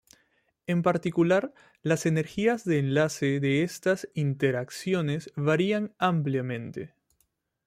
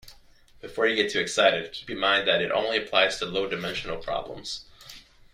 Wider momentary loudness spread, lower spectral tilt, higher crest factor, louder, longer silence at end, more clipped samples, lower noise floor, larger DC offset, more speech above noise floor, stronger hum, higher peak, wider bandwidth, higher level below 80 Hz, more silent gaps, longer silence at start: second, 10 LU vs 16 LU; first, -6.5 dB/octave vs -2.5 dB/octave; about the same, 18 dB vs 20 dB; about the same, -27 LUFS vs -25 LUFS; first, 0.8 s vs 0.35 s; neither; first, -74 dBFS vs -54 dBFS; neither; first, 47 dB vs 28 dB; neither; second, -10 dBFS vs -6 dBFS; about the same, 15.5 kHz vs 15.5 kHz; second, -66 dBFS vs -54 dBFS; neither; first, 0.7 s vs 0.05 s